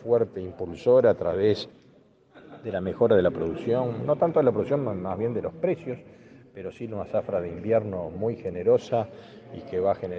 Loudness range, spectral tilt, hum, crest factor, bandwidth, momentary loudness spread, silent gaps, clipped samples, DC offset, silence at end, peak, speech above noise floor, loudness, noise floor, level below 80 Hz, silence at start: 5 LU; -8.5 dB/octave; none; 18 dB; 7.2 kHz; 16 LU; none; under 0.1%; under 0.1%; 0 s; -8 dBFS; 32 dB; -26 LUFS; -57 dBFS; -62 dBFS; 0 s